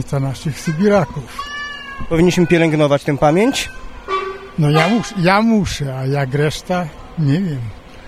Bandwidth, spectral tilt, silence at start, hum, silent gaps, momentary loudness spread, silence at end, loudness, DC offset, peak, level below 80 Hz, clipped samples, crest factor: 15 kHz; -6 dB/octave; 0 s; none; none; 13 LU; 0 s; -17 LUFS; under 0.1%; 0 dBFS; -38 dBFS; under 0.1%; 16 dB